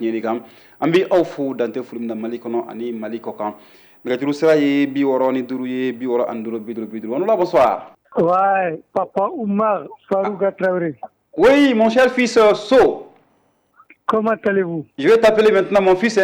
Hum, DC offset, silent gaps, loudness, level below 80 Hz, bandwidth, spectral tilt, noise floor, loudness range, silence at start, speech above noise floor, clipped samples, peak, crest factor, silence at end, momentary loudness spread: none; under 0.1%; none; -18 LUFS; -54 dBFS; over 20 kHz; -5.5 dB/octave; -61 dBFS; 6 LU; 0 s; 44 dB; under 0.1%; -6 dBFS; 12 dB; 0 s; 14 LU